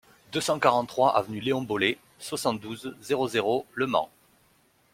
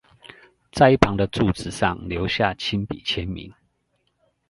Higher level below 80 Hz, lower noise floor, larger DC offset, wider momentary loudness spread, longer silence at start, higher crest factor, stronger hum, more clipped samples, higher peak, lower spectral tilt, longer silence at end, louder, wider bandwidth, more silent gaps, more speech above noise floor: second, -66 dBFS vs -40 dBFS; second, -64 dBFS vs -70 dBFS; neither; about the same, 12 LU vs 11 LU; second, 0.3 s vs 0.75 s; about the same, 22 dB vs 24 dB; neither; neither; second, -6 dBFS vs 0 dBFS; second, -4 dB/octave vs -6 dB/octave; second, 0.85 s vs 1 s; second, -27 LUFS vs -22 LUFS; first, 16.5 kHz vs 11.5 kHz; neither; second, 38 dB vs 49 dB